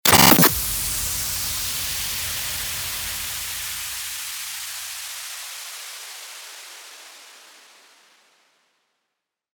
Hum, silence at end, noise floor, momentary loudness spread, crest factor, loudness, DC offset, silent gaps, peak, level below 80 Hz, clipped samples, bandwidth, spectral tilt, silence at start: none; 2.05 s; -81 dBFS; 22 LU; 24 dB; -21 LUFS; under 0.1%; none; 0 dBFS; -46 dBFS; under 0.1%; over 20 kHz; -2 dB/octave; 0.05 s